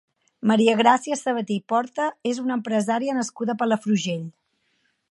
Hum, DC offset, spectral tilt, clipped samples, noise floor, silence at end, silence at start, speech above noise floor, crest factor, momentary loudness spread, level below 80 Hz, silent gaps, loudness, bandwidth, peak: none; under 0.1%; -5 dB/octave; under 0.1%; -69 dBFS; 0.8 s; 0.45 s; 47 dB; 20 dB; 9 LU; -76 dBFS; none; -23 LUFS; 11.5 kHz; -4 dBFS